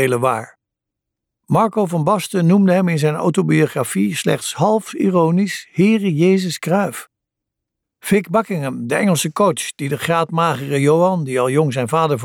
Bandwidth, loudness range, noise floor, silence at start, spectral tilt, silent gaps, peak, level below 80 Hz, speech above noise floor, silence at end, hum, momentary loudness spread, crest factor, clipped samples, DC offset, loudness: 17.5 kHz; 3 LU; -82 dBFS; 0 s; -6 dB/octave; none; -2 dBFS; -62 dBFS; 66 dB; 0 s; none; 6 LU; 14 dB; under 0.1%; under 0.1%; -17 LUFS